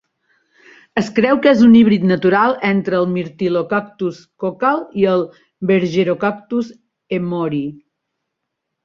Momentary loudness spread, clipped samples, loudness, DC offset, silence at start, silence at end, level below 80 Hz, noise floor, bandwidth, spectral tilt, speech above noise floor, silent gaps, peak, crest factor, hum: 14 LU; under 0.1%; -16 LUFS; under 0.1%; 0.95 s; 1.1 s; -56 dBFS; -77 dBFS; 7.2 kHz; -7.5 dB/octave; 62 dB; none; 0 dBFS; 16 dB; none